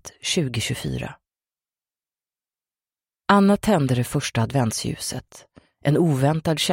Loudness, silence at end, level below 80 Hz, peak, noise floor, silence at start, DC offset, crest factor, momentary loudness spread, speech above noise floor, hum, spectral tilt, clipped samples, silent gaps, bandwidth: -22 LUFS; 0 s; -50 dBFS; -2 dBFS; under -90 dBFS; 0.05 s; under 0.1%; 22 dB; 12 LU; over 69 dB; none; -5 dB/octave; under 0.1%; none; 16.5 kHz